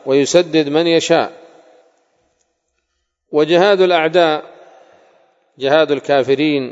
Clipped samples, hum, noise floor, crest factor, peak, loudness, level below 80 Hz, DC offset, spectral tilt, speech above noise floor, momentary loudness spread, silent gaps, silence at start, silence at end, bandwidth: under 0.1%; none; -71 dBFS; 16 dB; 0 dBFS; -14 LUFS; -68 dBFS; under 0.1%; -4.5 dB/octave; 58 dB; 7 LU; none; 0.05 s; 0 s; 8 kHz